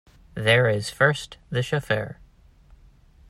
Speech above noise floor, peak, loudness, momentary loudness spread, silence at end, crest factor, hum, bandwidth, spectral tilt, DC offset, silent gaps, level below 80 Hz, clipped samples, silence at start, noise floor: 30 dB; -6 dBFS; -23 LUFS; 13 LU; 1.15 s; 20 dB; none; 14.5 kHz; -5 dB/octave; under 0.1%; none; -52 dBFS; under 0.1%; 0.35 s; -53 dBFS